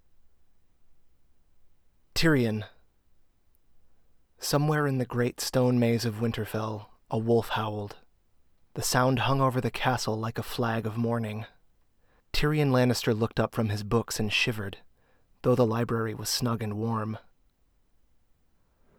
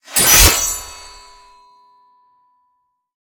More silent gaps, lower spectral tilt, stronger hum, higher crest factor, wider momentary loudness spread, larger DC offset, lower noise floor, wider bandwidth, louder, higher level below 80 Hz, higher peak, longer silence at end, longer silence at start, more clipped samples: neither; first, -5.5 dB/octave vs -1 dB/octave; neither; about the same, 20 dB vs 18 dB; second, 12 LU vs 26 LU; neither; about the same, -66 dBFS vs -67 dBFS; about the same, 20 kHz vs over 20 kHz; second, -28 LUFS vs -10 LUFS; second, -48 dBFS vs -28 dBFS; second, -10 dBFS vs 0 dBFS; second, 1.8 s vs 2.35 s; first, 0.25 s vs 0.1 s; neither